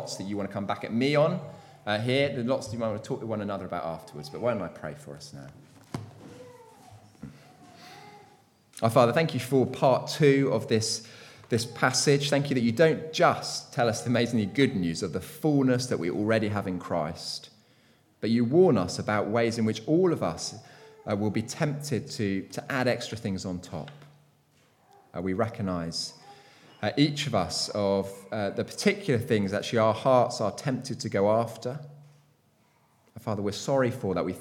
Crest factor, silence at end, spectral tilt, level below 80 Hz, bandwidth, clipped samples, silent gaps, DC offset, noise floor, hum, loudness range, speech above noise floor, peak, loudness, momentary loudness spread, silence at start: 22 dB; 0 s; -5.5 dB/octave; -64 dBFS; 18 kHz; under 0.1%; none; under 0.1%; -65 dBFS; none; 10 LU; 38 dB; -6 dBFS; -27 LUFS; 17 LU; 0 s